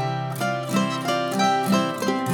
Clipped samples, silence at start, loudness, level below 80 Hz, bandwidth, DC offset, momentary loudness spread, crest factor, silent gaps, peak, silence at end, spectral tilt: under 0.1%; 0 s; -23 LUFS; -70 dBFS; over 20 kHz; under 0.1%; 5 LU; 14 dB; none; -8 dBFS; 0 s; -5 dB/octave